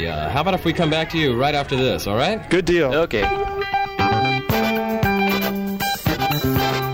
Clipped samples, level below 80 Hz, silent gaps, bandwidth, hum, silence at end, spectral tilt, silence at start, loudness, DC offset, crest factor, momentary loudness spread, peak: under 0.1%; -38 dBFS; none; 16.5 kHz; none; 0 s; -5.5 dB/octave; 0 s; -20 LUFS; under 0.1%; 12 dB; 4 LU; -8 dBFS